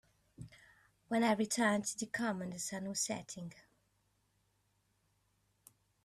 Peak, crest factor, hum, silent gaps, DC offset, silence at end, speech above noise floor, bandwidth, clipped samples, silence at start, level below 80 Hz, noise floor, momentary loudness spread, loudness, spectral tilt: -20 dBFS; 20 dB; none; none; under 0.1%; 2.45 s; 41 dB; 14 kHz; under 0.1%; 0.4 s; -74 dBFS; -78 dBFS; 23 LU; -36 LUFS; -3.5 dB/octave